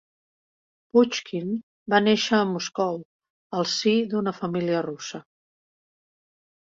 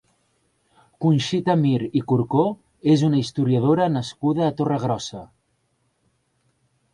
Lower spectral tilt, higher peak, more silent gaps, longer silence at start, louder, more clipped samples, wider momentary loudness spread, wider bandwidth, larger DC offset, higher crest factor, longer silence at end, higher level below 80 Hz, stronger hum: second, -4.5 dB/octave vs -7 dB/octave; about the same, -6 dBFS vs -6 dBFS; first, 1.63-1.86 s, 3.05-3.20 s, 3.30-3.50 s vs none; about the same, 0.95 s vs 1 s; second, -24 LUFS vs -21 LUFS; neither; first, 12 LU vs 7 LU; second, 7.8 kHz vs 11 kHz; neither; about the same, 20 dB vs 18 dB; second, 1.45 s vs 1.7 s; second, -68 dBFS vs -60 dBFS; neither